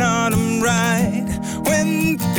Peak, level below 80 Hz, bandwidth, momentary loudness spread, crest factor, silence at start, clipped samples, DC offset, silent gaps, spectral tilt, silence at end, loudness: -8 dBFS; -40 dBFS; 18 kHz; 5 LU; 10 dB; 0 s; under 0.1%; under 0.1%; none; -5 dB/octave; 0 s; -18 LUFS